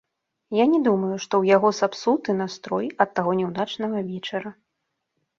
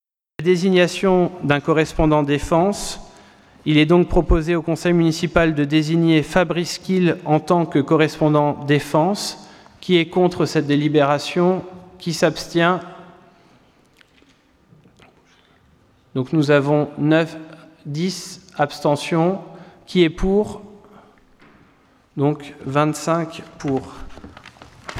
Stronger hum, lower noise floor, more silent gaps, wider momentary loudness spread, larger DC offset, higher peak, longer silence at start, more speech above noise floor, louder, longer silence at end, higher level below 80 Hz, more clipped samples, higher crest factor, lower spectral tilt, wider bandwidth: neither; first, -79 dBFS vs -55 dBFS; neither; second, 10 LU vs 14 LU; neither; about the same, -4 dBFS vs -2 dBFS; about the same, 0.5 s vs 0.4 s; first, 56 dB vs 37 dB; second, -23 LUFS vs -19 LUFS; first, 0.85 s vs 0 s; second, -68 dBFS vs -36 dBFS; neither; about the same, 20 dB vs 18 dB; about the same, -5.5 dB/octave vs -6 dB/octave; second, 7.6 kHz vs 14.5 kHz